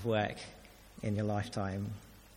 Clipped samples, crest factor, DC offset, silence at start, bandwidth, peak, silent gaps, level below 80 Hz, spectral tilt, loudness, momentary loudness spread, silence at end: under 0.1%; 18 dB; under 0.1%; 0 s; 16.5 kHz; -20 dBFS; none; -60 dBFS; -6.5 dB/octave; -37 LUFS; 16 LU; 0 s